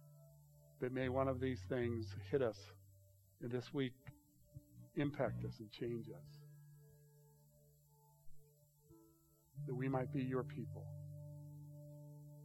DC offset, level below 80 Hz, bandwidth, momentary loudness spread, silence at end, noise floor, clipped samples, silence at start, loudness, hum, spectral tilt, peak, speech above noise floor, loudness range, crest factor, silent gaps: under 0.1%; -72 dBFS; 17 kHz; 22 LU; 0 s; -71 dBFS; under 0.1%; 0 s; -44 LUFS; none; -8 dB/octave; -24 dBFS; 29 dB; 11 LU; 20 dB; none